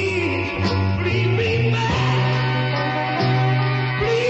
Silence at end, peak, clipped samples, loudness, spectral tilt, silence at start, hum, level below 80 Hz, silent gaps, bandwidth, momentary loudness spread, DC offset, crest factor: 0 s; -8 dBFS; under 0.1%; -20 LUFS; -6.5 dB/octave; 0 s; none; -42 dBFS; none; 8.2 kHz; 3 LU; under 0.1%; 12 dB